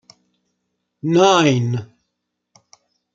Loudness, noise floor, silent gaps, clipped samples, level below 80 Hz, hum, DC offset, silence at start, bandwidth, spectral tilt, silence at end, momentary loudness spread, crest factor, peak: -16 LUFS; -77 dBFS; none; under 0.1%; -64 dBFS; none; under 0.1%; 1.05 s; 8.8 kHz; -5.5 dB/octave; 1.3 s; 15 LU; 20 dB; -2 dBFS